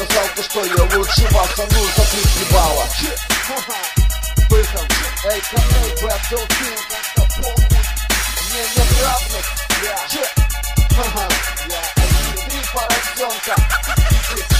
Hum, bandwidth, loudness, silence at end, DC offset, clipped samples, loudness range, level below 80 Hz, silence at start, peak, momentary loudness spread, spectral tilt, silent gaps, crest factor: none; 16 kHz; -17 LUFS; 0 s; under 0.1%; under 0.1%; 2 LU; -18 dBFS; 0 s; 0 dBFS; 6 LU; -3.5 dB/octave; none; 16 dB